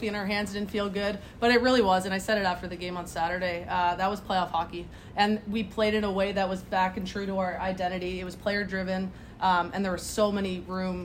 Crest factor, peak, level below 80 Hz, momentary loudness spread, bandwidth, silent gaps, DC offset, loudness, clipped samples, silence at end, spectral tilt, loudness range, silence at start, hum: 18 dB; -10 dBFS; -50 dBFS; 9 LU; 16 kHz; none; under 0.1%; -28 LUFS; under 0.1%; 0 s; -5 dB/octave; 3 LU; 0 s; none